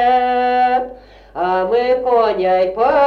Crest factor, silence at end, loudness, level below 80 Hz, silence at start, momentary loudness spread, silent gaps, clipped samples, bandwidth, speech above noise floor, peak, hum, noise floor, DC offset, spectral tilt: 10 dB; 0 s; -16 LUFS; -46 dBFS; 0 s; 7 LU; none; under 0.1%; 6 kHz; 23 dB; -4 dBFS; 50 Hz at -45 dBFS; -37 dBFS; under 0.1%; -6 dB/octave